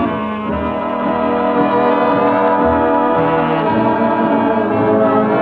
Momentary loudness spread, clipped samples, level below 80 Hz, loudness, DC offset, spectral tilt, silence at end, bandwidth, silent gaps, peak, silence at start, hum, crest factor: 6 LU; under 0.1%; -40 dBFS; -14 LUFS; under 0.1%; -9.5 dB/octave; 0 s; 5 kHz; none; -2 dBFS; 0 s; none; 12 dB